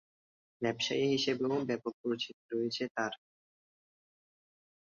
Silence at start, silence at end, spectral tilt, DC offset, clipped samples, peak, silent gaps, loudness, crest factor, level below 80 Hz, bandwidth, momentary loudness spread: 0.6 s; 1.7 s; -4.5 dB/octave; under 0.1%; under 0.1%; -18 dBFS; 1.94-2.04 s, 2.33-2.49 s, 2.90-2.95 s; -34 LUFS; 18 dB; -78 dBFS; 7.6 kHz; 7 LU